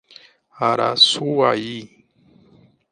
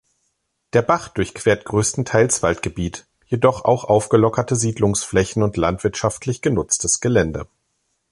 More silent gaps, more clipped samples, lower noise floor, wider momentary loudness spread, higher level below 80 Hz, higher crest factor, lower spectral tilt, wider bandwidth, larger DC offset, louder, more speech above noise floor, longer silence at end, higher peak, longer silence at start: neither; neither; second, -54 dBFS vs -71 dBFS; first, 15 LU vs 9 LU; second, -68 dBFS vs -42 dBFS; about the same, 20 dB vs 18 dB; second, -3.5 dB/octave vs -5 dB/octave; about the same, 11 kHz vs 11.5 kHz; neither; about the same, -17 LUFS vs -19 LUFS; second, 36 dB vs 53 dB; first, 1.05 s vs 0.7 s; about the same, 0 dBFS vs -2 dBFS; second, 0.55 s vs 0.75 s